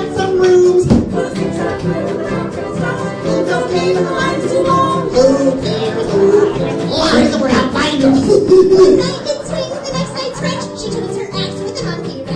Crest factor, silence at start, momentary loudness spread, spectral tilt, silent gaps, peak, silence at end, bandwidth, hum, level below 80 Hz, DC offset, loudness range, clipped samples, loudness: 14 dB; 0 s; 11 LU; -5.5 dB/octave; none; 0 dBFS; 0 s; 10.5 kHz; none; -38 dBFS; under 0.1%; 6 LU; under 0.1%; -14 LUFS